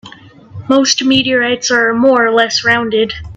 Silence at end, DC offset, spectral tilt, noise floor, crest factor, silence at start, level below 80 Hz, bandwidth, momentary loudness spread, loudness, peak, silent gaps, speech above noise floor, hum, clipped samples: 0 s; under 0.1%; -3 dB/octave; -37 dBFS; 12 dB; 0.05 s; -44 dBFS; 8.2 kHz; 4 LU; -11 LUFS; 0 dBFS; none; 25 dB; none; under 0.1%